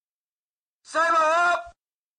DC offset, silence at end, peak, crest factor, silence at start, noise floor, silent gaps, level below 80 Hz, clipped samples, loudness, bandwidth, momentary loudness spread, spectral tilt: under 0.1%; 0.5 s; -14 dBFS; 12 dB; 0.9 s; under -90 dBFS; none; -66 dBFS; under 0.1%; -22 LUFS; 10.5 kHz; 9 LU; -1 dB/octave